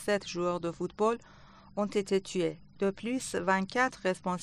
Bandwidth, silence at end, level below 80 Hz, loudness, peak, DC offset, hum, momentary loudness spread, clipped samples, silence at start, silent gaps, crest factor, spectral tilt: 11.5 kHz; 0 s; -64 dBFS; -32 LUFS; -14 dBFS; under 0.1%; none; 6 LU; under 0.1%; 0 s; none; 18 dB; -5 dB/octave